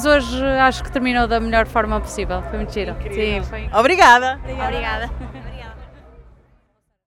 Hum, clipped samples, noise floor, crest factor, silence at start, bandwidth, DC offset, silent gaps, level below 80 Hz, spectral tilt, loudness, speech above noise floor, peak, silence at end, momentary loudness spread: none; under 0.1%; -63 dBFS; 18 dB; 0 s; 16 kHz; under 0.1%; none; -30 dBFS; -4.5 dB/octave; -18 LUFS; 46 dB; 0 dBFS; 0.85 s; 19 LU